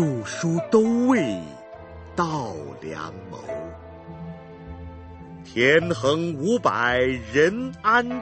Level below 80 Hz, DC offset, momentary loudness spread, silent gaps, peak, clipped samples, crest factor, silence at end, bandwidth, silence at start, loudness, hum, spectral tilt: -50 dBFS; under 0.1%; 21 LU; none; -6 dBFS; under 0.1%; 18 dB; 0 s; 8.8 kHz; 0 s; -22 LUFS; none; -5.5 dB/octave